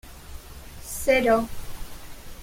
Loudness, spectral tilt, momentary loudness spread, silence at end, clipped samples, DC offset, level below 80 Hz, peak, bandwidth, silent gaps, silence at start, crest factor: -23 LUFS; -4 dB/octave; 24 LU; 0 s; under 0.1%; under 0.1%; -42 dBFS; -8 dBFS; 16.5 kHz; none; 0.05 s; 18 dB